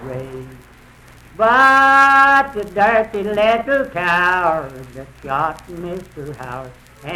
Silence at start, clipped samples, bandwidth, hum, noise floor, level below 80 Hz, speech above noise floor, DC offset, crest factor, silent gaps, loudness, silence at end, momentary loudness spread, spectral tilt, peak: 0 s; under 0.1%; 14.5 kHz; none; -44 dBFS; -46 dBFS; 28 dB; under 0.1%; 14 dB; none; -14 LUFS; 0 s; 23 LU; -4.5 dB/octave; -2 dBFS